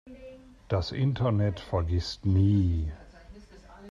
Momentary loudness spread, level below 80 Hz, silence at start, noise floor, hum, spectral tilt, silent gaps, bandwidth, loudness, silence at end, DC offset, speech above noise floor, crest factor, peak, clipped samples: 24 LU; -44 dBFS; 0.05 s; -50 dBFS; none; -8 dB/octave; none; 7.2 kHz; -28 LUFS; 0 s; under 0.1%; 24 dB; 14 dB; -14 dBFS; under 0.1%